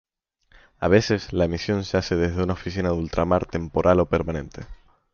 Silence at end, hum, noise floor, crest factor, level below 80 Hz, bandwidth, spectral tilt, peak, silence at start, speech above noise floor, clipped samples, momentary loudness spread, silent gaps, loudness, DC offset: 0.4 s; none; -61 dBFS; 20 dB; -38 dBFS; 7 kHz; -6.5 dB/octave; -4 dBFS; 0.8 s; 39 dB; under 0.1%; 9 LU; none; -23 LUFS; under 0.1%